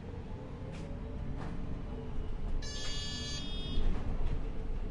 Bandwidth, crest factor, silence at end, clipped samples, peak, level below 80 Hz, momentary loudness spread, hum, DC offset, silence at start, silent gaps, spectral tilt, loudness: 11 kHz; 16 dB; 0 s; under 0.1%; -20 dBFS; -38 dBFS; 6 LU; none; under 0.1%; 0 s; none; -5 dB/octave; -41 LUFS